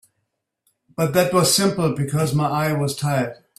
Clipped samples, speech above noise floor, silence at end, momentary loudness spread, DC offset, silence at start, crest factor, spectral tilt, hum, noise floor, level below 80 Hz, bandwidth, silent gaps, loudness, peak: under 0.1%; 56 dB; 0.25 s; 7 LU; under 0.1%; 1 s; 18 dB; -4.5 dB/octave; none; -76 dBFS; -56 dBFS; 16 kHz; none; -20 LUFS; -2 dBFS